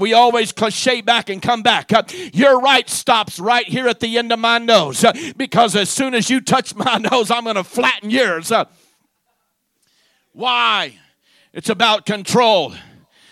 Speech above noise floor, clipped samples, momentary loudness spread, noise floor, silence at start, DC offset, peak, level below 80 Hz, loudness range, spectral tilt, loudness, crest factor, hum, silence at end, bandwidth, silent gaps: 53 dB; under 0.1%; 7 LU; -69 dBFS; 0 s; under 0.1%; 0 dBFS; -62 dBFS; 5 LU; -3 dB/octave; -15 LUFS; 16 dB; none; 0.5 s; 15.5 kHz; none